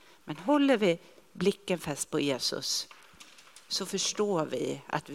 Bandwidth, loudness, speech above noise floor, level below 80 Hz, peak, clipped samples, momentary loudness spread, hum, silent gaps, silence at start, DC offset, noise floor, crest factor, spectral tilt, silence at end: 16 kHz; -30 LUFS; 25 dB; -68 dBFS; -12 dBFS; under 0.1%; 11 LU; none; none; 0.25 s; under 0.1%; -55 dBFS; 20 dB; -3.5 dB/octave; 0 s